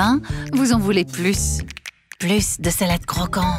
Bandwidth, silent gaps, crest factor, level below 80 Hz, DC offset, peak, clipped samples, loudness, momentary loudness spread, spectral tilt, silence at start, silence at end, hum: 16 kHz; none; 16 dB; -32 dBFS; under 0.1%; -4 dBFS; under 0.1%; -20 LUFS; 9 LU; -4.5 dB/octave; 0 s; 0 s; none